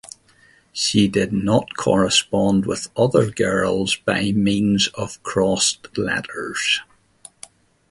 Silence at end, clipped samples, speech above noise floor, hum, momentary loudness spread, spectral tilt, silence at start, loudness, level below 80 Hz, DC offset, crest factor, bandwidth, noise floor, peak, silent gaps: 1.05 s; under 0.1%; 35 dB; none; 8 LU; -4 dB/octave; 0.75 s; -19 LUFS; -48 dBFS; under 0.1%; 18 dB; 11.5 kHz; -54 dBFS; -2 dBFS; none